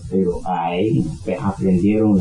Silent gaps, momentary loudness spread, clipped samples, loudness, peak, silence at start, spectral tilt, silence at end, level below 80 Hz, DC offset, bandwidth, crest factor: none; 7 LU; under 0.1%; -19 LUFS; -6 dBFS; 0 s; -8.5 dB/octave; 0 s; -40 dBFS; under 0.1%; 10.5 kHz; 12 dB